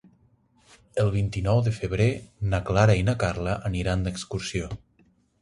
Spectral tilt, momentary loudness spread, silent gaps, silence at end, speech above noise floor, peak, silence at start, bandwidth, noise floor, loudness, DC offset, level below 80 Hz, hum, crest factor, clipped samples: -6.5 dB/octave; 11 LU; none; 0.65 s; 39 dB; -6 dBFS; 0.95 s; 11.5 kHz; -63 dBFS; -26 LUFS; under 0.1%; -40 dBFS; none; 20 dB; under 0.1%